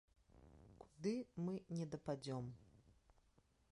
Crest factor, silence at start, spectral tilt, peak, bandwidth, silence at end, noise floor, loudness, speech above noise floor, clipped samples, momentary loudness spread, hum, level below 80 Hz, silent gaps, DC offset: 18 dB; 0.35 s; -7 dB/octave; -30 dBFS; 11 kHz; 0.85 s; -76 dBFS; -47 LUFS; 31 dB; under 0.1%; 20 LU; none; -74 dBFS; none; under 0.1%